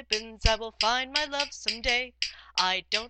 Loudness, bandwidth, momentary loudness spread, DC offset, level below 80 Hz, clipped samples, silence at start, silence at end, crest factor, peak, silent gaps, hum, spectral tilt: -27 LUFS; 9 kHz; 4 LU; under 0.1%; -38 dBFS; under 0.1%; 0 s; 0 s; 24 dB; -6 dBFS; none; none; -2 dB/octave